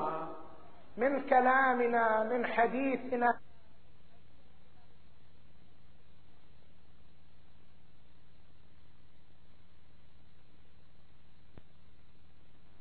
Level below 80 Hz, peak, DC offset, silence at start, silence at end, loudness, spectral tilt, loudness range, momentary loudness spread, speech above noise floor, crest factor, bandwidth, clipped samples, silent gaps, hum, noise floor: -68 dBFS; -14 dBFS; 0.7%; 0 s; 1.2 s; -30 LUFS; -3.5 dB/octave; 10 LU; 18 LU; 33 dB; 24 dB; 4.5 kHz; under 0.1%; none; none; -63 dBFS